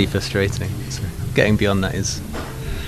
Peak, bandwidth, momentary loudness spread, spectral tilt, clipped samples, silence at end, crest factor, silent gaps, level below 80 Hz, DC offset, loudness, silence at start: -2 dBFS; 14 kHz; 11 LU; -5 dB/octave; under 0.1%; 0 s; 20 dB; none; -32 dBFS; under 0.1%; -21 LUFS; 0 s